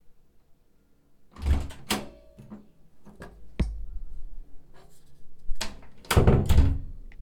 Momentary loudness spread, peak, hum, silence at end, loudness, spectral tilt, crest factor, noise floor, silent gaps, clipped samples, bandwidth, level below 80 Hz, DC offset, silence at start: 27 LU; -6 dBFS; none; 0.05 s; -27 LUFS; -6 dB/octave; 22 dB; -60 dBFS; none; under 0.1%; 18.5 kHz; -32 dBFS; under 0.1%; 0.05 s